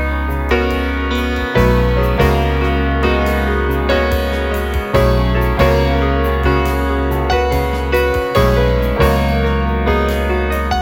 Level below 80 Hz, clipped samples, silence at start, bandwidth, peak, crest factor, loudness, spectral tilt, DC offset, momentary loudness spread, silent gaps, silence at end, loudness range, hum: -18 dBFS; under 0.1%; 0 s; 17 kHz; 0 dBFS; 14 dB; -15 LUFS; -6.5 dB/octave; under 0.1%; 4 LU; none; 0 s; 0 LU; none